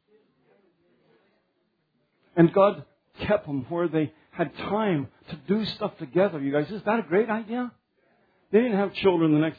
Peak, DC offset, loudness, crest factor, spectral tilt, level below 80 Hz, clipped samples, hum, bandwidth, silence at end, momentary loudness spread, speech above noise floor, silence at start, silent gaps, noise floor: -4 dBFS; under 0.1%; -25 LUFS; 22 dB; -9.5 dB/octave; -60 dBFS; under 0.1%; none; 5 kHz; 0.05 s; 11 LU; 48 dB; 2.35 s; none; -73 dBFS